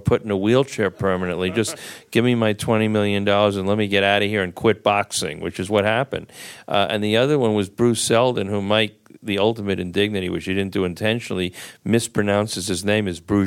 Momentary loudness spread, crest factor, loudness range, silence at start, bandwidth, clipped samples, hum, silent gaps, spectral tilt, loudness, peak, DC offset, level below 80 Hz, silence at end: 8 LU; 18 dB; 3 LU; 0 s; 16.5 kHz; under 0.1%; none; none; -5 dB/octave; -20 LUFS; -2 dBFS; under 0.1%; -52 dBFS; 0 s